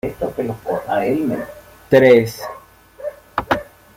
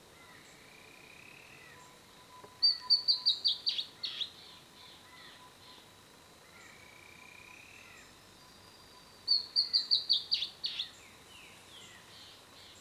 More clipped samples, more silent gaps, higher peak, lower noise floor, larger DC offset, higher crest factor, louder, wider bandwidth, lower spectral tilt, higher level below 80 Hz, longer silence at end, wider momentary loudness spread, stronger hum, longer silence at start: neither; neither; first, -2 dBFS vs -16 dBFS; second, -42 dBFS vs -58 dBFS; neither; second, 16 dB vs 22 dB; first, -18 LUFS vs -30 LUFS; about the same, 16.5 kHz vs 16 kHz; first, -6.5 dB/octave vs -0.5 dB/octave; first, -48 dBFS vs -74 dBFS; first, 0.35 s vs 0 s; second, 20 LU vs 26 LU; neither; second, 0.05 s vs 0.2 s